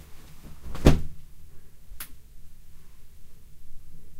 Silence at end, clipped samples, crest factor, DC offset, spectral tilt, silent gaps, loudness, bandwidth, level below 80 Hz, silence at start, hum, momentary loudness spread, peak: 0 s; under 0.1%; 28 dB; under 0.1%; -6.5 dB/octave; none; -27 LUFS; 16 kHz; -34 dBFS; 0 s; none; 27 LU; -2 dBFS